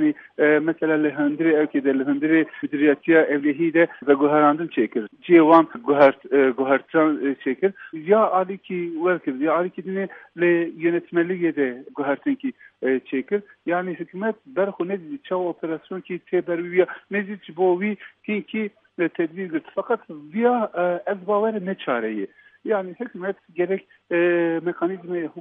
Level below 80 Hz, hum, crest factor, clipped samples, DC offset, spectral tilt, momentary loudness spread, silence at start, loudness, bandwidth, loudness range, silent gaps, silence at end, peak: -76 dBFS; none; 20 dB; under 0.1%; under 0.1%; -9.5 dB/octave; 12 LU; 0 s; -22 LUFS; 3.9 kHz; 8 LU; none; 0 s; -2 dBFS